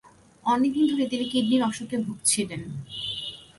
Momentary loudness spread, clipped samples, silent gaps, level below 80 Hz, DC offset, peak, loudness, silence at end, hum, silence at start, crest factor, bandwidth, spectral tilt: 10 LU; under 0.1%; none; -62 dBFS; under 0.1%; -8 dBFS; -26 LUFS; 0.15 s; none; 0.05 s; 18 dB; 12 kHz; -3.5 dB/octave